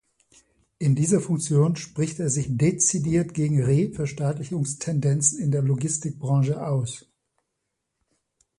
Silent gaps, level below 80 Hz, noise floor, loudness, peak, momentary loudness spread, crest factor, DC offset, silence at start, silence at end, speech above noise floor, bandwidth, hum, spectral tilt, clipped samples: none; -56 dBFS; -80 dBFS; -24 LUFS; -6 dBFS; 7 LU; 18 dB; under 0.1%; 0.8 s; 1.6 s; 57 dB; 11.5 kHz; none; -6 dB/octave; under 0.1%